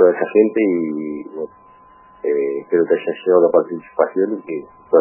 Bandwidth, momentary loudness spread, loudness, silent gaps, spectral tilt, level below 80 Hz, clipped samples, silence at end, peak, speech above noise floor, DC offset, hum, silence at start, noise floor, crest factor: 3.1 kHz; 15 LU; -18 LUFS; none; -11 dB/octave; -68 dBFS; under 0.1%; 0 s; 0 dBFS; 30 dB; under 0.1%; none; 0 s; -47 dBFS; 18 dB